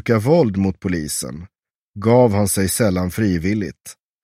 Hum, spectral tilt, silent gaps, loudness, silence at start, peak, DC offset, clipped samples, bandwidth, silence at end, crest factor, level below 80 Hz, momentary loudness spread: none; -6 dB/octave; 1.75-1.92 s; -18 LUFS; 0.05 s; -2 dBFS; under 0.1%; under 0.1%; 16 kHz; 0.3 s; 18 dB; -44 dBFS; 13 LU